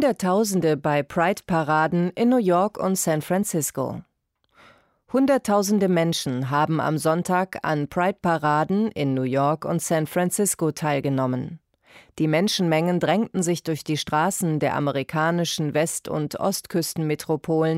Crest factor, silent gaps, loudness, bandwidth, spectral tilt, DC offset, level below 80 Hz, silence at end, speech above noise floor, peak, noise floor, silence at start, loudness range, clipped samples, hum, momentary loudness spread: 14 dB; none; -23 LUFS; 16 kHz; -5 dB/octave; under 0.1%; -60 dBFS; 0 s; 47 dB; -8 dBFS; -69 dBFS; 0 s; 2 LU; under 0.1%; none; 6 LU